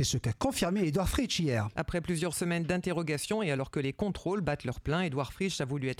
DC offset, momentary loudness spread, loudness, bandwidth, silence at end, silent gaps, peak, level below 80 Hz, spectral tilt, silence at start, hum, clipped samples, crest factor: under 0.1%; 4 LU; -32 LUFS; 16.5 kHz; 0.05 s; none; -14 dBFS; -46 dBFS; -5 dB/octave; 0 s; none; under 0.1%; 16 dB